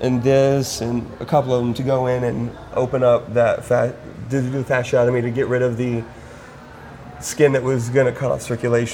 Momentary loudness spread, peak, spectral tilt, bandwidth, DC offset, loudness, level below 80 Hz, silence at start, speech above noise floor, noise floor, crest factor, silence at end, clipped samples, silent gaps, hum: 18 LU; -2 dBFS; -6 dB/octave; 17 kHz; under 0.1%; -19 LUFS; -46 dBFS; 0 s; 20 dB; -39 dBFS; 16 dB; 0 s; under 0.1%; none; none